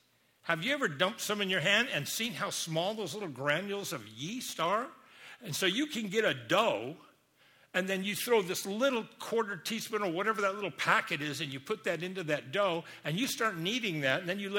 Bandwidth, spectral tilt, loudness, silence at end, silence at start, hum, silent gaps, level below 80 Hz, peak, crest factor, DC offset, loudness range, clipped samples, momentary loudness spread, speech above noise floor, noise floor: 17 kHz; -3.5 dB/octave; -32 LUFS; 0 s; 0.45 s; none; none; -78 dBFS; -12 dBFS; 22 dB; under 0.1%; 3 LU; under 0.1%; 9 LU; 33 dB; -65 dBFS